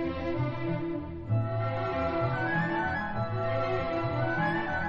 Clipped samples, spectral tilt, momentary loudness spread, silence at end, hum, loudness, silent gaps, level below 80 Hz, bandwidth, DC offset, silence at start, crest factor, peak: under 0.1%; -6 dB/octave; 4 LU; 0 s; none; -30 LUFS; none; -50 dBFS; 7 kHz; under 0.1%; 0 s; 12 dB; -18 dBFS